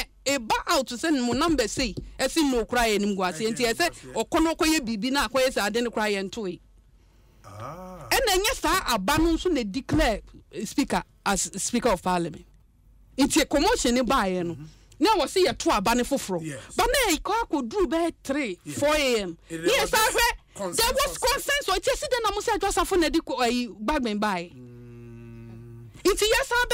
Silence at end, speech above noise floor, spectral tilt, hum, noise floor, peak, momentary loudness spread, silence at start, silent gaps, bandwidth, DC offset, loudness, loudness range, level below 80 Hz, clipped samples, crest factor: 0 s; 31 dB; -3 dB/octave; none; -56 dBFS; -10 dBFS; 12 LU; 0 s; none; 16 kHz; under 0.1%; -24 LUFS; 4 LU; -42 dBFS; under 0.1%; 16 dB